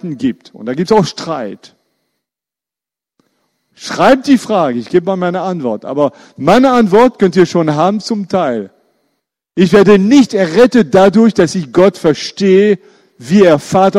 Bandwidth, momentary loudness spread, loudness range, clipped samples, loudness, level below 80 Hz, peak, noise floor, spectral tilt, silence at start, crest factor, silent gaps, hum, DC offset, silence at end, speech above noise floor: 12.5 kHz; 11 LU; 10 LU; 0.2%; -11 LUFS; -48 dBFS; 0 dBFS; -87 dBFS; -6 dB/octave; 0.05 s; 12 dB; none; none; under 0.1%; 0 s; 77 dB